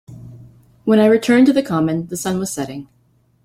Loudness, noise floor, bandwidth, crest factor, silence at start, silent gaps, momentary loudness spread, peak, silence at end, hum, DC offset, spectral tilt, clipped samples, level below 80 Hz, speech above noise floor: -16 LUFS; -58 dBFS; 16 kHz; 16 dB; 0.1 s; none; 14 LU; -2 dBFS; 0.6 s; none; under 0.1%; -5.5 dB/octave; under 0.1%; -54 dBFS; 42 dB